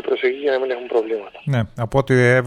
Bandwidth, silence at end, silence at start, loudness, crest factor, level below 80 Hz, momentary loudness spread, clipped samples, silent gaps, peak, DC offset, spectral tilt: 10.5 kHz; 0 s; 0.05 s; -20 LUFS; 16 dB; -46 dBFS; 8 LU; under 0.1%; none; -2 dBFS; under 0.1%; -7 dB/octave